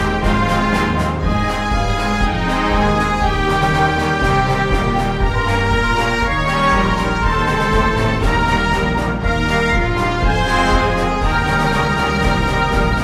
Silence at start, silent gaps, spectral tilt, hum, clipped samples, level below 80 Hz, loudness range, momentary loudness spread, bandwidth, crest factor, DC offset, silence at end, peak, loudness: 0 s; none; -5.5 dB/octave; none; under 0.1%; -22 dBFS; 1 LU; 3 LU; 14 kHz; 14 dB; under 0.1%; 0 s; -2 dBFS; -16 LUFS